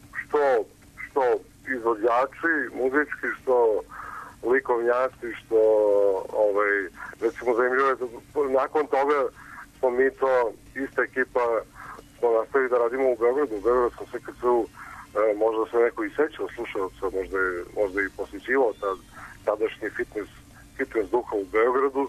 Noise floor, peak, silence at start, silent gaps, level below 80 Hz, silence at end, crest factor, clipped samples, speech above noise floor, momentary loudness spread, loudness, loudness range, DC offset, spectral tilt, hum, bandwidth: -43 dBFS; -12 dBFS; 0.15 s; none; -56 dBFS; 0 s; 14 dB; under 0.1%; 19 dB; 13 LU; -25 LUFS; 4 LU; under 0.1%; -5.5 dB/octave; none; 13.5 kHz